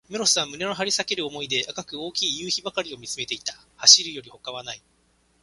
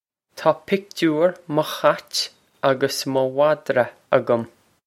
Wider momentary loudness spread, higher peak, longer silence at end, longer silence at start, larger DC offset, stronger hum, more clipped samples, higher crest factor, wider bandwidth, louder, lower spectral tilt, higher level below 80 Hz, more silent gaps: first, 20 LU vs 6 LU; about the same, 0 dBFS vs 0 dBFS; first, 0.65 s vs 0.4 s; second, 0.1 s vs 0.35 s; neither; neither; neither; first, 26 dB vs 20 dB; second, 12 kHz vs 16.5 kHz; about the same, -21 LUFS vs -21 LUFS; second, 0 dB/octave vs -4.5 dB/octave; about the same, -66 dBFS vs -68 dBFS; neither